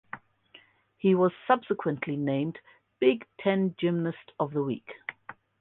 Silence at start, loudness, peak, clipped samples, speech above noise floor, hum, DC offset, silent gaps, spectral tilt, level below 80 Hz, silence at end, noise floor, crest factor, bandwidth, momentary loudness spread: 0.15 s; -28 LUFS; -8 dBFS; under 0.1%; 31 dB; none; under 0.1%; none; -10.5 dB/octave; -72 dBFS; 0.3 s; -58 dBFS; 20 dB; 4.1 kHz; 17 LU